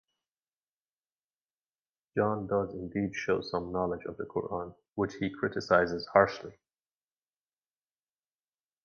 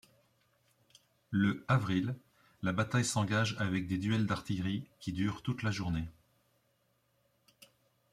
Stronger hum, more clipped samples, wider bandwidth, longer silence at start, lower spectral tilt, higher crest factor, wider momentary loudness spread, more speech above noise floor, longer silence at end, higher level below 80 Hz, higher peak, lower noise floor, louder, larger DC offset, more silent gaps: neither; neither; second, 7.2 kHz vs 14.5 kHz; first, 2.15 s vs 1.3 s; about the same, -6.5 dB/octave vs -5.5 dB/octave; first, 26 dB vs 20 dB; first, 12 LU vs 8 LU; first, over 59 dB vs 42 dB; first, 2.3 s vs 2 s; about the same, -60 dBFS vs -62 dBFS; first, -6 dBFS vs -16 dBFS; first, under -90 dBFS vs -75 dBFS; first, -31 LUFS vs -34 LUFS; neither; first, 4.92-4.96 s vs none